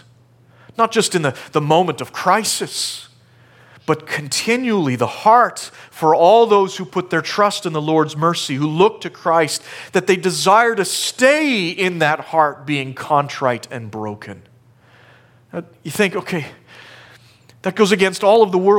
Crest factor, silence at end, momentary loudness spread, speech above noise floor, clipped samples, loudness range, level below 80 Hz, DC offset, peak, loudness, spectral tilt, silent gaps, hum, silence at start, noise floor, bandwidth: 16 dB; 0 s; 15 LU; 34 dB; under 0.1%; 9 LU; -66 dBFS; under 0.1%; 0 dBFS; -17 LUFS; -4 dB/octave; none; none; 0.8 s; -50 dBFS; 17.5 kHz